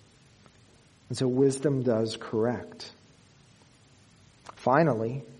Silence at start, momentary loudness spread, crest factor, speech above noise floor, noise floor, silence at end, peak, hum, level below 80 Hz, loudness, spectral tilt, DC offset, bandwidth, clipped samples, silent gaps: 1.1 s; 19 LU; 22 dB; 32 dB; -58 dBFS; 0.05 s; -8 dBFS; none; -68 dBFS; -27 LUFS; -6.5 dB/octave; under 0.1%; 11.5 kHz; under 0.1%; none